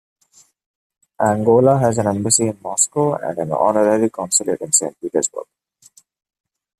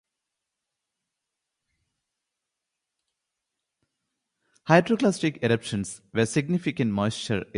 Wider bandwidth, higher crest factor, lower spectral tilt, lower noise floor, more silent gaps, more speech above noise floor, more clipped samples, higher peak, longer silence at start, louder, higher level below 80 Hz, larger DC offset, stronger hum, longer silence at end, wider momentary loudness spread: first, 14.5 kHz vs 11 kHz; second, 18 dB vs 24 dB; about the same, -4.5 dB/octave vs -5.5 dB/octave; second, -54 dBFS vs -85 dBFS; neither; second, 37 dB vs 60 dB; neither; first, 0 dBFS vs -6 dBFS; second, 1.2 s vs 4.65 s; first, -17 LUFS vs -25 LUFS; about the same, -58 dBFS vs -60 dBFS; neither; neither; first, 1.35 s vs 0 s; about the same, 8 LU vs 10 LU